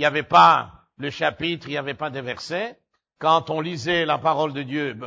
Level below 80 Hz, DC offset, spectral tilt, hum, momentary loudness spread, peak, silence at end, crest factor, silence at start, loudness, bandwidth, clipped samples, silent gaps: -58 dBFS; under 0.1%; -5 dB/octave; none; 15 LU; -2 dBFS; 0 s; 20 dB; 0 s; -21 LUFS; 8 kHz; under 0.1%; none